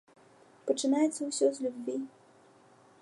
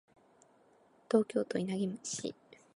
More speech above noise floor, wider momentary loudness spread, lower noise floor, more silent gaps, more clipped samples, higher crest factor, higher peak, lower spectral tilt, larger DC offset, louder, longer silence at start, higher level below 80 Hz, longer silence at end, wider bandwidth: about the same, 30 dB vs 33 dB; first, 12 LU vs 9 LU; second, -60 dBFS vs -66 dBFS; neither; neither; about the same, 18 dB vs 22 dB; about the same, -14 dBFS vs -14 dBFS; second, -3 dB/octave vs -5 dB/octave; neither; first, -31 LUFS vs -35 LUFS; second, 0.65 s vs 1.1 s; second, -88 dBFS vs -78 dBFS; first, 0.95 s vs 0.45 s; about the same, 11.5 kHz vs 11.5 kHz